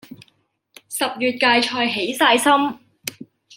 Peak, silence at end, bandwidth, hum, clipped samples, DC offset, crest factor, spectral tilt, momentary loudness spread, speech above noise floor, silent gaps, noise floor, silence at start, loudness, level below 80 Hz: 0 dBFS; 0 s; 17 kHz; none; under 0.1%; under 0.1%; 20 dB; -2 dB/octave; 16 LU; 45 dB; none; -64 dBFS; 0.1 s; -18 LUFS; -70 dBFS